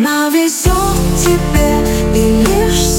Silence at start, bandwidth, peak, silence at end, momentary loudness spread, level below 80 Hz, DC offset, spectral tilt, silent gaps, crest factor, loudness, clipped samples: 0 s; 17.5 kHz; 0 dBFS; 0 s; 2 LU; -18 dBFS; under 0.1%; -4.5 dB/octave; none; 12 dB; -12 LUFS; under 0.1%